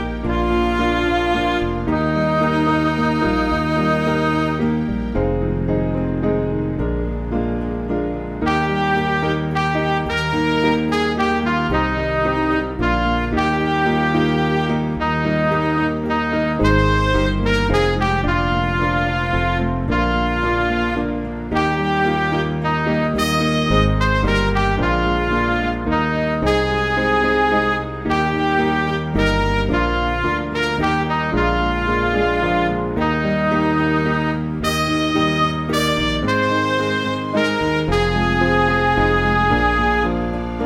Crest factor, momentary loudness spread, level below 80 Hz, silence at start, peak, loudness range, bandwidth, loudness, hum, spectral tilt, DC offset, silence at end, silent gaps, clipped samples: 16 dB; 4 LU; -28 dBFS; 0 s; -2 dBFS; 2 LU; 16 kHz; -19 LUFS; none; -6.5 dB/octave; 0.1%; 0 s; none; under 0.1%